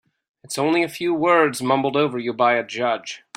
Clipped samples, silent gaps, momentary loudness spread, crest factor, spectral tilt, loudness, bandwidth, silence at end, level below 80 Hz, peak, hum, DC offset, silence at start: under 0.1%; none; 7 LU; 18 dB; -4.5 dB/octave; -20 LUFS; 16 kHz; 0.2 s; -66 dBFS; -4 dBFS; none; under 0.1%; 0.45 s